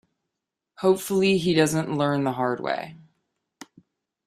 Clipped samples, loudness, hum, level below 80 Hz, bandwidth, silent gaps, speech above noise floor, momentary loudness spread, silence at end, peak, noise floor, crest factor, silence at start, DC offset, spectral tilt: under 0.1%; -23 LUFS; none; -62 dBFS; 15.5 kHz; none; 62 dB; 9 LU; 1.3 s; -6 dBFS; -84 dBFS; 20 dB; 0.8 s; under 0.1%; -5.5 dB/octave